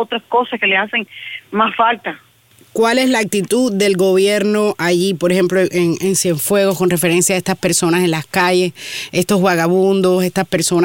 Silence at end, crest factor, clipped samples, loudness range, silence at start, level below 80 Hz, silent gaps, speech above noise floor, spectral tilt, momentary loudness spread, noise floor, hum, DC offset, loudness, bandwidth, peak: 0 s; 14 dB; under 0.1%; 2 LU; 0 s; -56 dBFS; none; 34 dB; -4 dB/octave; 7 LU; -49 dBFS; none; under 0.1%; -15 LUFS; 17 kHz; 0 dBFS